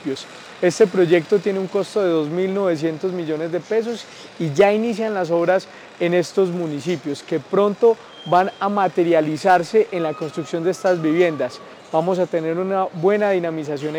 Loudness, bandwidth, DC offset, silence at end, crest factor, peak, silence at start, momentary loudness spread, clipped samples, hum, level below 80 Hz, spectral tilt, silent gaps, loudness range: -20 LUFS; 12 kHz; under 0.1%; 0 s; 14 dB; -4 dBFS; 0 s; 9 LU; under 0.1%; none; -70 dBFS; -6 dB/octave; none; 2 LU